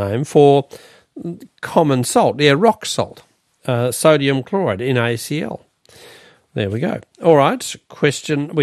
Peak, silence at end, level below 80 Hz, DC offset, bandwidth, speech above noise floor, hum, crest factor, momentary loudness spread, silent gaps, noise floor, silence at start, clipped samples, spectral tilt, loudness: 0 dBFS; 0 s; -60 dBFS; under 0.1%; 14.5 kHz; 29 dB; none; 18 dB; 18 LU; none; -45 dBFS; 0 s; under 0.1%; -5.5 dB/octave; -17 LUFS